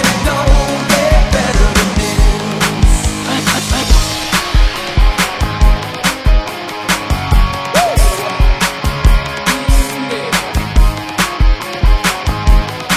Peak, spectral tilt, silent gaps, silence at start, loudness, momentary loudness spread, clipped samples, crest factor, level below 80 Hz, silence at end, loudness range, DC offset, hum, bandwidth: 0 dBFS; -4 dB/octave; none; 0 s; -14 LUFS; 4 LU; 0.1%; 12 dB; -14 dBFS; 0 s; 2 LU; under 0.1%; none; 16 kHz